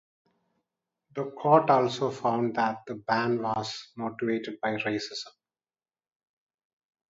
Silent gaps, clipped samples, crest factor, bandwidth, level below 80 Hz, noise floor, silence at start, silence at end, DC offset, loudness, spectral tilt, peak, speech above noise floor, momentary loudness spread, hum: none; under 0.1%; 22 dB; 7.8 kHz; -72 dBFS; under -90 dBFS; 1.15 s; 1.8 s; under 0.1%; -28 LUFS; -5.5 dB/octave; -8 dBFS; over 63 dB; 14 LU; none